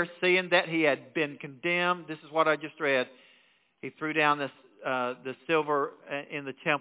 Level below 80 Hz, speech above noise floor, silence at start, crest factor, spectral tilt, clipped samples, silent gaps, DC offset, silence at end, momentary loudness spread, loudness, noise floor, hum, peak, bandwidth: -86 dBFS; 36 dB; 0 s; 22 dB; -2.5 dB/octave; under 0.1%; none; under 0.1%; 0 s; 13 LU; -29 LUFS; -65 dBFS; none; -8 dBFS; 4 kHz